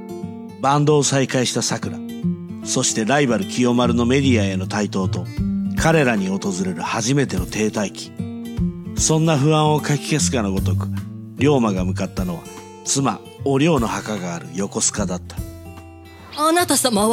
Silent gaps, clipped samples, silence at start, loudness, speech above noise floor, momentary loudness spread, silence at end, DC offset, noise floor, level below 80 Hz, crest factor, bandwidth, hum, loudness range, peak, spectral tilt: none; under 0.1%; 0 s; -20 LUFS; 21 dB; 13 LU; 0 s; under 0.1%; -40 dBFS; -40 dBFS; 16 dB; 16.5 kHz; none; 3 LU; -2 dBFS; -4.5 dB/octave